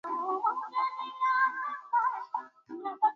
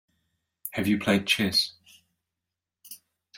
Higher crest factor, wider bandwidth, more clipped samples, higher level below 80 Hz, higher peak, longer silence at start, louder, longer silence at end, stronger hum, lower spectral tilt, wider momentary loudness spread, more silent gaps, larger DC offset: second, 16 dB vs 22 dB; second, 6.8 kHz vs 16.5 kHz; neither; second, under -90 dBFS vs -66 dBFS; second, -16 dBFS vs -8 dBFS; second, 0.05 s vs 0.65 s; second, -31 LUFS vs -25 LUFS; about the same, 0 s vs 0 s; neither; about the same, -3 dB/octave vs -4 dB/octave; second, 12 LU vs 23 LU; neither; neither